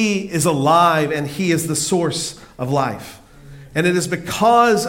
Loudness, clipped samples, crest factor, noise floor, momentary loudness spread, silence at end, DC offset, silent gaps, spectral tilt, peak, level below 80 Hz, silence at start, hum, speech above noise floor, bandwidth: -18 LUFS; under 0.1%; 16 dB; -40 dBFS; 12 LU; 0 s; under 0.1%; none; -4.5 dB/octave; -2 dBFS; -50 dBFS; 0 s; none; 23 dB; 17 kHz